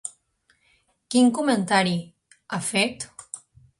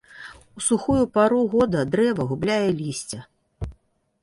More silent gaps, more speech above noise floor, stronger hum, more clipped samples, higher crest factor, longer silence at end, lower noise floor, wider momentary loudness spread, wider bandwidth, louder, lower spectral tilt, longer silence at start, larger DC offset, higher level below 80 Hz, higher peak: neither; first, 45 dB vs 39 dB; neither; neither; about the same, 20 dB vs 16 dB; about the same, 0.45 s vs 0.5 s; first, -66 dBFS vs -61 dBFS; about the same, 18 LU vs 18 LU; about the same, 11.5 kHz vs 11.5 kHz; about the same, -23 LUFS vs -22 LUFS; second, -4 dB/octave vs -5.5 dB/octave; about the same, 0.05 s vs 0.15 s; neither; second, -66 dBFS vs -46 dBFS; about the same, -6 dBFS vs -6 dBFS